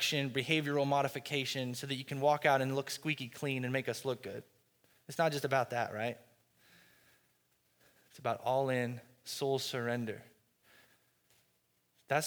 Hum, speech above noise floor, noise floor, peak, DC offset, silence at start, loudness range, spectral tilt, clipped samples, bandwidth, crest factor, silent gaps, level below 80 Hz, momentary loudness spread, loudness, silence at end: none; 41 dB; -76 dBFS; -14 dBFS; under 0.1%; 0 s; 6 LU; -4.5 dB/octave; under 0.1%; over 20 kHz; 22 dB; none; -82 dBFS; 11 LU; -35 LUFS; 0 s